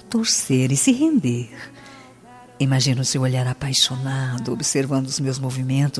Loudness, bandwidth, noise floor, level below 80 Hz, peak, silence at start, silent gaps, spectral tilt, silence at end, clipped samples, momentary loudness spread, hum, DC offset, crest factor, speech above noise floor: -20 LUFS; 11 kHz; -45 dBFS; -56 dBFS; -4 dBFS; 0.05 s; none; -4.5 dB/octave; 0 s; under 0.1%; 8 LU; none; under 0.1%; 18 dB; 25 dB